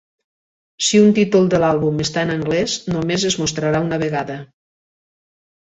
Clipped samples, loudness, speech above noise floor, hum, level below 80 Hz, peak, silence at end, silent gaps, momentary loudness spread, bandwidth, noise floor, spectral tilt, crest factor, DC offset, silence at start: under 0.1%; -17 LUFS; over 73 dB; none; -50 dBFS; -2 dBFS; 1.15 s; none; 8 LU; 8.4 kHz; under -90 dBFS; -4.5 dB/octave; 16 dB; under 0.1%; 0.8 s